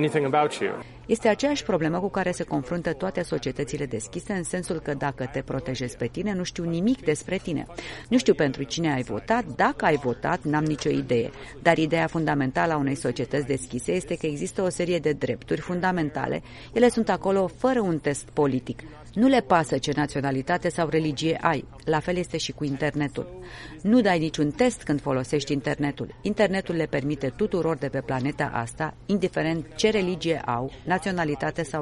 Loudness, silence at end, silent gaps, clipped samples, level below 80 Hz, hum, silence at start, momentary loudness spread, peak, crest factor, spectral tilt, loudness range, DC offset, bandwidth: -26 LUFS; 0 s; none; under 0.1%; -50 dBFS; none; 0 s; 8 LU; -4 dBFS; 20 dB; -5.5 dB/octave; 4 LU; under 0.1%; 11.5 kHz